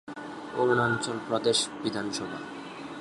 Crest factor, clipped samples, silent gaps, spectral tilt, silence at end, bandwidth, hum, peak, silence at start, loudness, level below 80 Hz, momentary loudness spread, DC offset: 18 dB; under 0.1%; none; -3.5 dB/octave; 0 s; 11.5 kHz; none; -12 dBFS; 0.05 s; -28 LUFS; -66 dBFS; 15 LU; under 0.1%